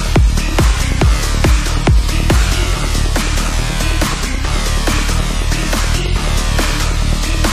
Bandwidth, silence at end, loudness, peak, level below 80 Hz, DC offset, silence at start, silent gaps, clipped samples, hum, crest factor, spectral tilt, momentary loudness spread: 15.5 kHz; 0 s; -16 LUFS; 0 dBFS; -14 dBFS; under 0.1%; 0 s; none; under 0.1%; none; 12 dB; -4 dB/octave; 3 LU